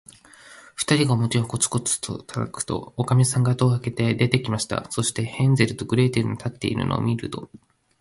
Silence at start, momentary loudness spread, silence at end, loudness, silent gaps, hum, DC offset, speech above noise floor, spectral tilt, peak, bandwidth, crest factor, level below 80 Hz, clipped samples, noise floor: 0.45 s; 9 LU; 0.55 s; -23 LUFS; none; none; under 0.1%; 25 dB; -5 dB/octave; -2 dBFS; 11.5 kHz; 20 dB; -50 dBFS; under 0.1%; -48 dBFS